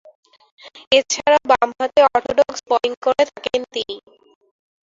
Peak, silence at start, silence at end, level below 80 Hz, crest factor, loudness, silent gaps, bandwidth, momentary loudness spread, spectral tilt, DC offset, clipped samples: 0 dBFS; 0.65 s; 0.9 s; -56 dBFS; 18 dB; -18 LUFS; 0.87-0.91 s, 2.97-3.02 s; 7.8 kHz; 11 LU; -1.5 dB/octave; under 0.1%; under 0.1%